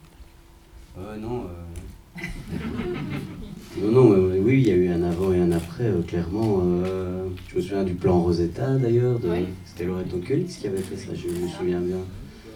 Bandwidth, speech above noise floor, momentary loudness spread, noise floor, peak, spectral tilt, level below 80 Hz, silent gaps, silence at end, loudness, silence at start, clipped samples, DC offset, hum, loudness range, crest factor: 15.5 kHz; 26 dB; 17 LU; -49 dBFS; -2 dBFS; -8 dB/octave; -44 dBFS; none; 0 s; -24 LUFS; 0.2 s; under 0.1%; under 0.1%; none; 9 LU; 22 dB